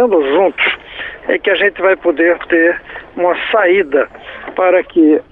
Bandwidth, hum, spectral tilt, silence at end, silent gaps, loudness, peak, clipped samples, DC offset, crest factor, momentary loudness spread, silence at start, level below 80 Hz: 4.1 kHz; none; -7 dB/octave; 0.1 s; none; -13 LUFS; -2 dBFS; under 0.1%; under 0.1%; 12 dB; 12 LU; 0 s; -50 dBFS